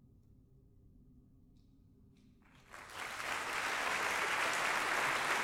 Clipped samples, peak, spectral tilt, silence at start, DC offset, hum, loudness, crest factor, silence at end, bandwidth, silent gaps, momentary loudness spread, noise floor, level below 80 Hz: under 0.1%; -20 dBFS; -1 dB/octave; 1 s; under 0.1%; none; -35 LUFS; 18 dB; 0 s; 16 kHz; none; 14 LU; -64 dBFS; -68 dBFS